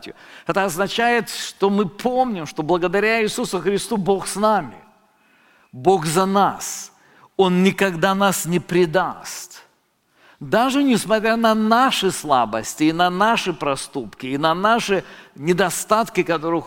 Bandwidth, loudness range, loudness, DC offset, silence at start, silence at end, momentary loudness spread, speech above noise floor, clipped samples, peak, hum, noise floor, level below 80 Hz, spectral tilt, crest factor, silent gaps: 17 kHz; 3 LU; -19 LUFS; under 0.1%; 0 s; 0 s; 11 LU; 44 dB; under 0.1%; -2 dBFS; none; -63 dBFS; -54 dBFS; -4.5 dB/octave; 18 dB; none